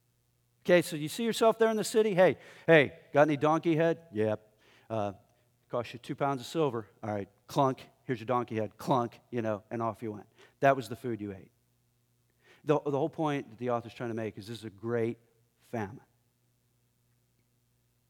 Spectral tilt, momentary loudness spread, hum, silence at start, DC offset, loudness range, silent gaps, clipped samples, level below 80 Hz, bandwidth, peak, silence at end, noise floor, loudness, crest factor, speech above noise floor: -6 dB/octave; 14 LU; 60 Hz at -65 dBFS; 0.65 s; under 0.1%; 11 LU; none; under 0.1%; -76 dBFS; 18 kHz; -8 dBFS; 2.1 s; -73 dBFS; -30 LUFS; 24 dB; 43 dB